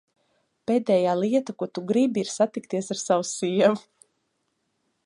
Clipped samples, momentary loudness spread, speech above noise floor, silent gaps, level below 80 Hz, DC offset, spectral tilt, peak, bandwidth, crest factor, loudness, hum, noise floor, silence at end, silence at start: under 0.1%; 10 LU; 51 dB; none; -76 dBFS; under 0.1%; -5 dB/octave; -6 dBFS; 11.5 kHz; 20 dB; -24 LUFS; none; -75 dBFS; 1.25 s; 0.7 s